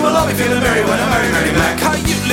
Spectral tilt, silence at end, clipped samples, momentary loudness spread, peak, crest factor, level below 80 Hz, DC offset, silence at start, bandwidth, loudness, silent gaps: -4 dB/octave; 0 s; under 0.1%; 2 LU; -2 dBFS; 14 dB; -30 dBFS; under 0.1%; 0 s; 18 kHz; -14 LUFS; none